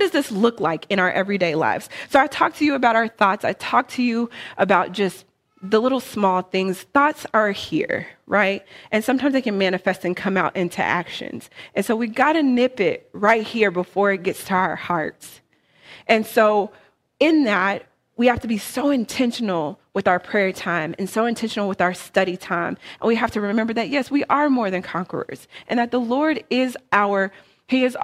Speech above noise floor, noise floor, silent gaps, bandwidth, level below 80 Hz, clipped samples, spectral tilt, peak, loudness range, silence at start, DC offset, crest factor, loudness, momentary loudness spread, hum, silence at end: 30 dB; -50 dBFS; none; 15.5 kHz; -58 dBFS; under 0.1%; -5 dB/octave; -2 dBFS; 3 LU; 0 s; under 0.1%; 18 dB; -21 LUFS; 8 LU; none; 0 s